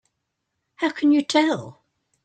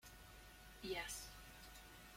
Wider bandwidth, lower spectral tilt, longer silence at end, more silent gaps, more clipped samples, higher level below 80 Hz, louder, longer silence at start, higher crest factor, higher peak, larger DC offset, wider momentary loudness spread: second, 9.2 kHz vs 16.5 kHz; first, -4 dB/octave vs -2.5 dB/octave; first, 0.55 s vs 0 s; neither; neither; second, -70 dBFS vs -64 dBFS; first, -21 LUFS vs -52 LUFS; first, 0.8 s vs 0 s; about the same, 18 dB vs 20 dB; first, -6 dBFS vs -34 dBFS; neither; second, 9 LU vs 14 LU